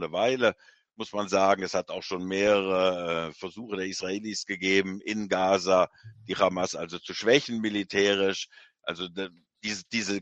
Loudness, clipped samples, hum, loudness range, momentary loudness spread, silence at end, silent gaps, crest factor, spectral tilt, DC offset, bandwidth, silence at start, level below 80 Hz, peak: -27 LUFS; under 0.1%; none; 2 LU; 13 LU; 0 s; none; 24 dB; -3.5 dB/octave; under 0.1%; 8.6 kHz; 0 s; -68 dBFS; -4 dBFS